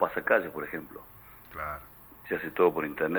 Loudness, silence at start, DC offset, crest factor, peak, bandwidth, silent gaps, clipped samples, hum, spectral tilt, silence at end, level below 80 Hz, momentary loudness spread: -30 LUFS; 0 s; under 0.1%; 22 dB; -8 dBFS; over 20 kHz; none; under 0.1%; none; -7 dB/octave; 0 s; -58 dBFS; 22 LU